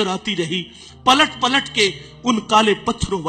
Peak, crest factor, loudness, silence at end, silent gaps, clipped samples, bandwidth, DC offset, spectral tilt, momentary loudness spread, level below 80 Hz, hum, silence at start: -2 dBFS; 16 dB; -18 LUFS; 0 s; none; under 0.1%; 15 kHz; under 0.1%; -3.5 dB/octave; 10 LU; -44 dBFS; none; 0 s